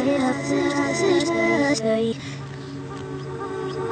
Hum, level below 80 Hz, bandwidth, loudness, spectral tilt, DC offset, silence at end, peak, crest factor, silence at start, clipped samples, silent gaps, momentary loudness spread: none; -58 dBFS; 9.4 kHz; -23 LUFS; -5 dB/octave; under 0.1%; 0 s; -8 dBFS; 14 dB; 0 s; under 0.1%; none; 14 LU